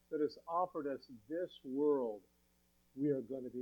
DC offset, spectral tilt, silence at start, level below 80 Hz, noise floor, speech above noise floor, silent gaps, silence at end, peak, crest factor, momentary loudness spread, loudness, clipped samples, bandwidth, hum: under 0.1%; -8 dB/octave; 0.1 s; -80 dBFS; -74 dBFS; 35 dB; none; 0 s; -24 dBFS; 16 dB; 11 LU; -39 LUFS; under 0.1%; 18.5 kHz; 60 Hz at -80 dBFS